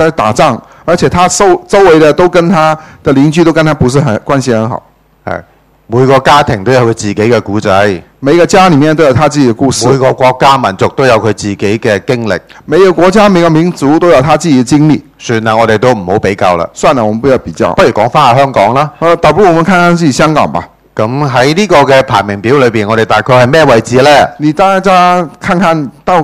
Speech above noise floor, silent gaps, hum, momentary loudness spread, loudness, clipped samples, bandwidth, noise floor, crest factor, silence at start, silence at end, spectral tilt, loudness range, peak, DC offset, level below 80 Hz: 28 dB; none; none; 7 LU; -7 LUFS; 4%; 15.5 kHz; -35 dBFS; 8 dB; 0 s; 0 s; -5.5 dB/octave; 3 LU; 0 dBFS; under 0.1%; -36 dBFS